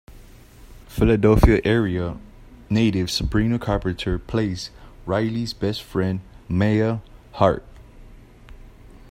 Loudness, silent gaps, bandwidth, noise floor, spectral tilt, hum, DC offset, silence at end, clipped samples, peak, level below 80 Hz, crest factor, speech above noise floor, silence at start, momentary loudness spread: -22 LUFS; none; 15.5 kHz; -45 dBFS; -6.5 dB/octave; none; under 0.1%; 0.25 s; under 0.1%; 0 dBFS; -32 dBFS; 22 dB; 25 dB; 0.1 s; 15 LU